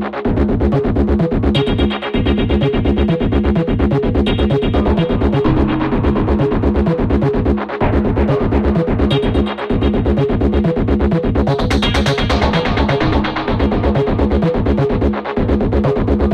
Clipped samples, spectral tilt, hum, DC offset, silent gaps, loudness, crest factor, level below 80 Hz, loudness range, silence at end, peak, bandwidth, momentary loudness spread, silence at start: under 0.1%; -8 dB/octave; none; under 0.1%; none; -15 LUFS; 14 dB; -20 dBFS; 1 LU; 0 s; 0 dBFS; 9.6 kHz; 2 LU; 0 s